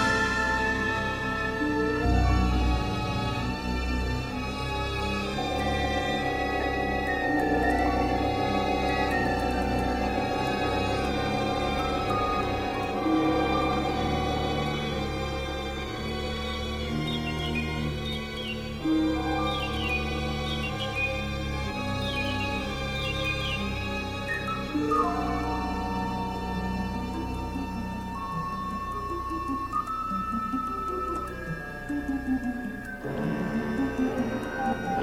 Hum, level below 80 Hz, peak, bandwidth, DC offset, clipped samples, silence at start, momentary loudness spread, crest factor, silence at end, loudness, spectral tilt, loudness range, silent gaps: none; -36 dBFS; -12 dBFS; 16 kHz; under 0.1%; under 0.1%; 0 s; 7 LU; 16 dB; 0 s; -28 LUFS; -5.5 dB/octave; 5 LU; none